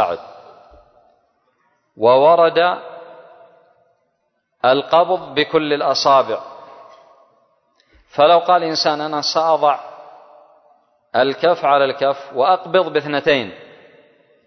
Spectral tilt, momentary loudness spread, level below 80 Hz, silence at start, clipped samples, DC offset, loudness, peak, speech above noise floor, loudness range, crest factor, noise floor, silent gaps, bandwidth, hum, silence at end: -4 dB/octave; 14 LU; -64 dBFS; 0 s; under 0.1%; under 0.1%; -16 LUFS; -2 dBFS; 54 dB; 1 LU; 16 dB; -69 dBFS; none; 6.4 kHz; none; 0.85 s